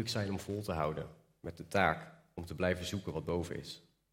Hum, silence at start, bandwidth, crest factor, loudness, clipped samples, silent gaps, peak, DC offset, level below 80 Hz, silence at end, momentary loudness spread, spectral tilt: none; 0 s; 16.5 kHz; 24 dB; -37 LUFS; under 0.1%; none; -14 dBFS; under 0.1%; -62 dBFS; 0.35 s; 17 LU; -5 dB/octave